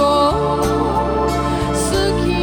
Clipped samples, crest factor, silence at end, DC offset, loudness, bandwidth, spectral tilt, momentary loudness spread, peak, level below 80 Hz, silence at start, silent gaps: under 0.1%; 12 dB; 0 s; under 0.1%; -17 LUFS; over 20 kHz; -5.5 dB/octave; 3 LU; -4 dBFS; -28 dBFS; 0 s; none